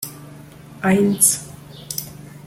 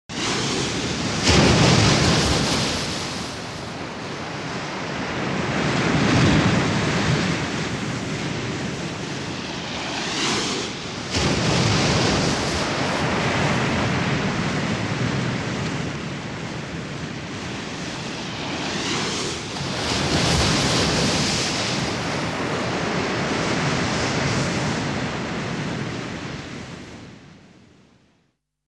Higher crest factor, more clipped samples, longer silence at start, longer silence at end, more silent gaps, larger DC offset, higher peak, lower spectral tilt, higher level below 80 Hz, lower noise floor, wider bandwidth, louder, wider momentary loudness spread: about the same, 20 dB vs 20 dB; neither; about the same, 0 s vs 0.1 s; second, 0.1 s vs 1.3 s; neither; neither; about the same, -2 dBFS vs -4 dBFS; about the same, -4 dB/octave vs -4 dB/octave; second, -54 dBFS vs -42 dBFS; second, -40 dBFS vs -68 dBFS; first, 16.5 kHz vs 13 kHz; first, -18 LUFS vs -22 LUFS; first, 24 LU vs 12 LU